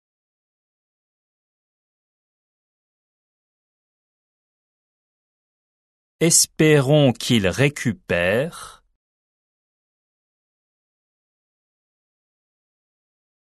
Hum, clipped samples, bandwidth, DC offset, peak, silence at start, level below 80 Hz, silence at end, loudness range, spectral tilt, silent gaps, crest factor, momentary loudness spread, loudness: none; under 0.1%; 12.5 kHz; under 0.1%; -4 dBFS; 6.2 s; -60 dBFS; 4.7 s; 10 LU; -4 dB/octave; none; 22 dB; 10 LU; -18 LUFS